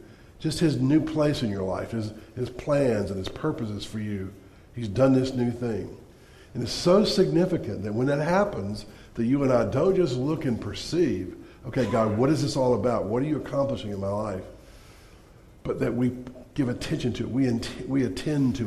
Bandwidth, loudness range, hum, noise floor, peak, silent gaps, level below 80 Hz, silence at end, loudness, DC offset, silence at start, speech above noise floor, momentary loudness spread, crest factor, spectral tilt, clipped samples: 13.5 kHz; 5 LU; none; -51 dBFS; -8 dBFS; none; -48 dBFS; 0 s; -26 LUFS; under 0.1%; 0 s; 26 dB; 13 LU; 18 dB; -6.5 dB/octave; under 0.1%